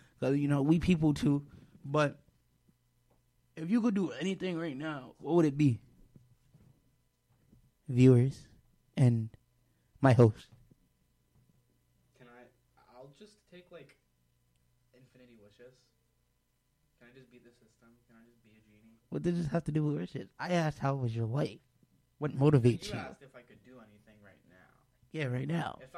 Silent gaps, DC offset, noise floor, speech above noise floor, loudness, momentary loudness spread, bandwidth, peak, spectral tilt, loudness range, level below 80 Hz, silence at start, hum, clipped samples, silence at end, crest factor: none; under 0.1%; -76 dBFS; 46 dB; -31 LUFS; 17 LU; 11.5 kHz; -10 dBFS; -8 dB/octave; 7 LU; -60 dBFS; 0.2 s; none; under 0.1%; 0 s; 22 dB